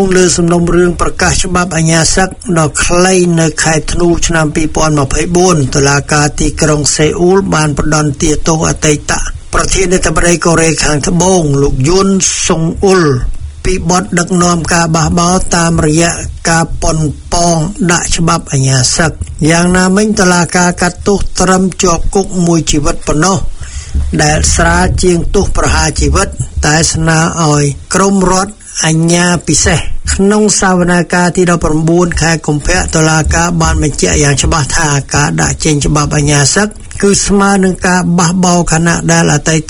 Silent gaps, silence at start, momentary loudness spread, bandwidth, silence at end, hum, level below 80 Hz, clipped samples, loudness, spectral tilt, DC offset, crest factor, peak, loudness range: none; 0 s; 5 LU; 13 kHz; 0 s; none; -20 dBFS; 0.5%; -10 LUFS; -4.5 dB/octave; under 0.1%; 10 dB; 0 dBFS; 2 LU